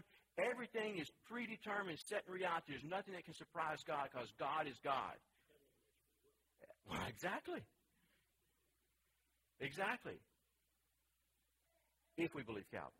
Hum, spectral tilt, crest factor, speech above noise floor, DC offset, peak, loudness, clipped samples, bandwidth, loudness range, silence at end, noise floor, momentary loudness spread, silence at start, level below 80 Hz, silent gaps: none; -4.5 dB/octave; 22 dB; 38 dB; under 0.1%; -26 dBFS; -46 LUFS; under 0.1%; 16 kHz; 7 LU; 0.1 s; -84 dBFS; 9 LU; 0.35 s; -78 dBFS; none